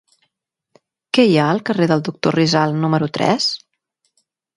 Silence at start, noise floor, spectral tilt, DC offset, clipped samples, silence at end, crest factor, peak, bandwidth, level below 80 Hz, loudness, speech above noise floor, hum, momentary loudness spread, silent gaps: 1.15 s; -76 dBFS; -5.5 dB/octave; under 0.1%; under 0.1%; 1 s; 18 dB; 0 dBFS; 11.5 kHz; -60 dBFS; -17 LUFS; 60 dB; none; 6 LU; none